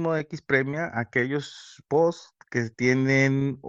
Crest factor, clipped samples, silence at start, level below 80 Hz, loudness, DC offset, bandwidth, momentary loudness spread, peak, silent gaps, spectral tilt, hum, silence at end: 18 dB; under 0.1%; 0 s; -64 dBFS; -25 LUFS; under 0.1%; 7.8 kHz; 11 LU; -8 dBFS; none; -6.5 dB/octave; none; 0 s